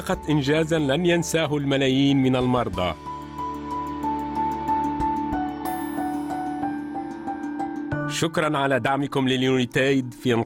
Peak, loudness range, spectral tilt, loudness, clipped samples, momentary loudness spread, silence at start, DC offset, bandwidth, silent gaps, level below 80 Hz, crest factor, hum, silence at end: -10 dBFS; 5 LU; -5.5 dB/octave; -24 LUFS; under 0.1%; 10 LU; 0 s; under 0.1%; 17.5 kHz; none; -48 dBFS; 14 dB; none; 0 s